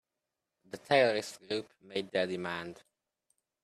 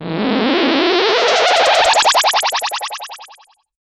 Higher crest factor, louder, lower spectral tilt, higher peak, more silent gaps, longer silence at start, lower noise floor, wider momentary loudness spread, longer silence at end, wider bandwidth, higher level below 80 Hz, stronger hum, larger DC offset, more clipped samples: first, 24 dB vs 14 dB; second, -32 LUFS vs -13 LUFS; first, -4 dB/octave vs -2 dB/octave; second, -12 dBFS vs -2 dBFS; neither; first, 0.75 s vs 0 s; first, -88 dBFS vs -47 dBFS; first, 19 LU vs 12 LU; first, 0.9 s vs 0.75 s; about the same, 14 kHz vs 14 kHz; second, -78 dBFS vs -56 dBFS; neither; neither; neither